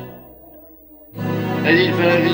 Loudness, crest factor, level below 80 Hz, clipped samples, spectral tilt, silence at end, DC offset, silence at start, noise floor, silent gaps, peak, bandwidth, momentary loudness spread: -17 LUFS; 16 dB; -54 dBFS; under 0.1%; -7 dB/octave; 0 s; under 0.1%; 0 s; -44 dBFS; none; -2 dBFS; 16.5 kHz; 20 LU